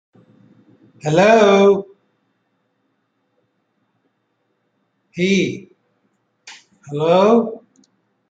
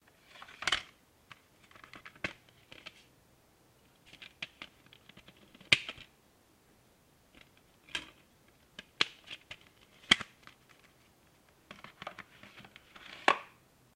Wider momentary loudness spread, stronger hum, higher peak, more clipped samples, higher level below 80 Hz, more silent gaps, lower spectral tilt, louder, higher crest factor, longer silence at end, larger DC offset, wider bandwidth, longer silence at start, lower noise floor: second, 20 LU vs 29 LU; neither; about the same, -2 dBFS vs -4 dBFS; neither; about the same, -64 dBFS vs -68 dBFS; neither; first, -6 dB/octave vs -1.5 dB/octave; first, -15 LUFS vs -33 LUFS; second, 18 dB vs 38 dB; first, 0.7 s vs 0.5 s; neither; second, 7.8 kHz vs 16 kHz; first, 1.05 s vs 0.4 s; about the same, -68 dBFS vs -66 dBFS